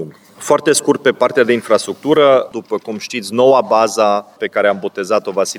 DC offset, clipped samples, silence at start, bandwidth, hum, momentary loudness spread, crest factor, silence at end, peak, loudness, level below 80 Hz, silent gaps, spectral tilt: under 0.1%; under 0.1%; 0 s; 18 kHz; none; 11 LU; 14 dB; 0 s; 0 dBFS; -14 LUFS; -64 dBFS; none; -3.5 dB/octave